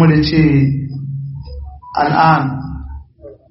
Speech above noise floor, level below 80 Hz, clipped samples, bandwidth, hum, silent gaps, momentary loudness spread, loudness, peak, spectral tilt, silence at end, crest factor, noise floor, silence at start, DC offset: 26 dB; -34 dBFS; under 0.1%; 5.8 kHz; none; none; 20 LU; -14 LUFS; 0 dBFS; -6 dB/octave; 0.15 s; 16 dB; -39 dBFS; 0 s; under 0.1%